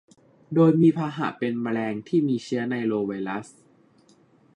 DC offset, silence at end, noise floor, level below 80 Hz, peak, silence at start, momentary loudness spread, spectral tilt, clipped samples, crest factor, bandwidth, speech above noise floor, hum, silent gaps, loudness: under 0.1%; 1.1 s; -58 dBFS; -70 dBFS; -8 dBFS; 0.5 s; 10 LU; -8 dB/octave; under 0.1%; 16 dB; 9.8 kHz; 35 dB; none; none; -24 LUFS